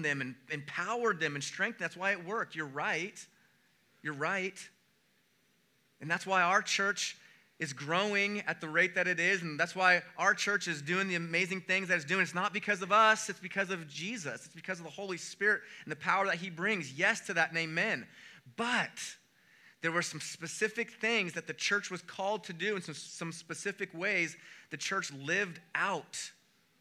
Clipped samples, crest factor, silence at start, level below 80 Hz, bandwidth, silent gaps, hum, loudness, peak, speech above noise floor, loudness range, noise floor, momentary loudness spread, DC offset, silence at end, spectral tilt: under 0.1%; 24 dB; 0 s; under -90 dBFS; 15.5 kHz; none; none; -32 LUFS; -10 dBFS; 38 dB; 6 LU; -72 dBFS; 13 LU; under 0.1%; 0.5 s; -3 dB/octave